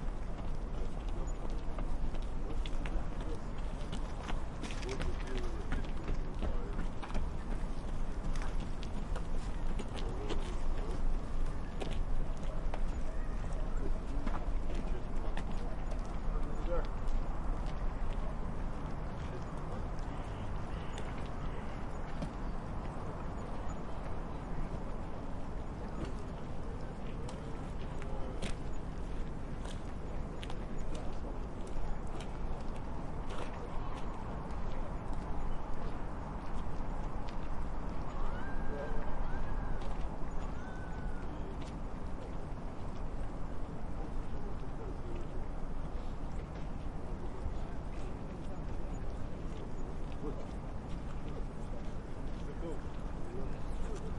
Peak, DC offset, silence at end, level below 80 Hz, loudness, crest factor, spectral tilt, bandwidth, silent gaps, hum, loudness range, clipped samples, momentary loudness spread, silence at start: -20 dBFS; under 0.1%; 0 s; -38 dBFS; -43 LUFS; 14 dB; -6.5 dB/octave; 10.5 kHz; none; none; 3 LU; under 0.1%; 3 LU; 0 s